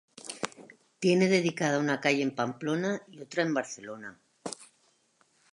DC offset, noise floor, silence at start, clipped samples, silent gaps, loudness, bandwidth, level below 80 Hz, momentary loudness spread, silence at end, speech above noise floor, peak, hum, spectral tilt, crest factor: under 0.1%; -69 dBFS; 0.25 s; under 0.1%; none; -29 LUFS; 11.5 kHz; -80 dBFS; 18 LU; 0.9 s; 40 dB; -10 dBFS; none; -5 dB/octave; 20 dB